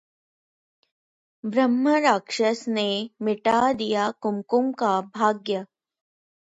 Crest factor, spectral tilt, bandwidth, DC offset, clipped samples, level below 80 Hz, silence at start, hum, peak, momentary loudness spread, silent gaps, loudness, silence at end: 18 dB; -4.5 dB/octave; 8 kHz; under 0.1%; under 0.1%; -68 dBFS; 1.45 s; none; -6 dBFS; 8 LU; none; -23 LUFS; 0.85 s